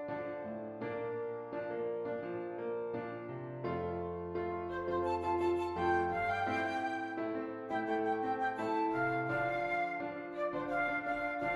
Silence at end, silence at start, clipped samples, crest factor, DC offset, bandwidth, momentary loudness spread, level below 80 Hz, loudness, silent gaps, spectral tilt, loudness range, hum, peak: 0 s; 0 s; under 0.1%; 14 dB; under 0.1%; 11.5 kHz; 8 LU; -66 dBFS; -37 LUFS; none; -7 dB/octave; 5 LU; none; -22 dBFS